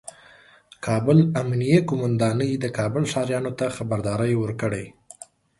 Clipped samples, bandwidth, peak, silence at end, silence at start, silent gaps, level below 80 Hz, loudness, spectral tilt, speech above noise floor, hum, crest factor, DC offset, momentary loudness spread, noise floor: under 0.1%; 11.5 kHz; -4 dBFS; 0.7 s; 0.05 s; none; -54 dBFS; -23 LUFS; -7 dB/octave; 30 dB; none; 18 dB; under 0.1%; 17 LU; -52 dBFS